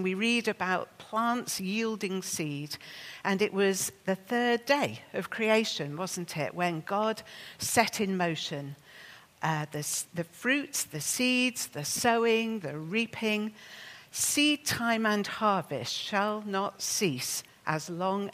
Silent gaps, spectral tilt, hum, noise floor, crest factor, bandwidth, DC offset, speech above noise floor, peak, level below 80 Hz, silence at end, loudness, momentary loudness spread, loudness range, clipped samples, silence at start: none; -3 dB/octave; none; -52 dBFS; 22 dB; 15.5 kHz; under 0.1%; 22 dB; -8 dBFS; -72 dBFS; 0 s; -30 LUFS; 10 LU; 3 LU; under 0.1%; 0 s